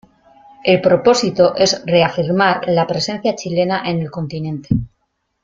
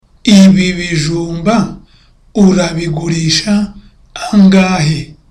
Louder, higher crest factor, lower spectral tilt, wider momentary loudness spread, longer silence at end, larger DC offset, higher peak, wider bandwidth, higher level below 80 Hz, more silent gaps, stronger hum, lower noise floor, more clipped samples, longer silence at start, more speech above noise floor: second, -16 LUFS vs -11 LUFS; first, 16 dB vs 10 dB; about the same, -5 dB/octave vs -5.5 dB/octave; second, 10 LU vs 14 LU; first, 0.55 s vs 0.2 s; neither; about the same, 0 dBFS vs 0 dBFS; second, 7.8 kHz vs 10.5 kHz; second, -44 dBFS vs -36 dBFS; neither; neither; first, -69 dBFS vs -45 dBFS; neither; first, 0.65 s vs 0.25 s; first, 53 dB vs 36 dB